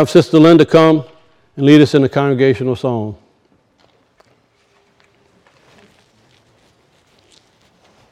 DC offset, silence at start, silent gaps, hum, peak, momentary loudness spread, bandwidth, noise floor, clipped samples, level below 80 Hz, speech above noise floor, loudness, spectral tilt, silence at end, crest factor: under 0.1%; 0 s; none; none; 0 dBFS; 11 LU; 11.5 kHz; -57 dBFS; 0.3%; -54 dBFS; 46 dB; -11 LUFS; -7 dB/octave; 4.95 s; 16 dB